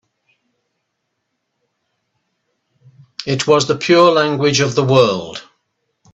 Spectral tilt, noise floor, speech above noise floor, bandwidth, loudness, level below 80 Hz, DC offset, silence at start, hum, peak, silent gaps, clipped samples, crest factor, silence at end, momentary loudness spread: -4.5 dB/octave; -73 dBFS; 59 dB; 8.4 kHz; -14 LUFS; -58 dBFS; under 0.1%; 3.2 s; none; 0 dBFS; none; under 0.1%; 18 dB; 0.7 s; 18 LU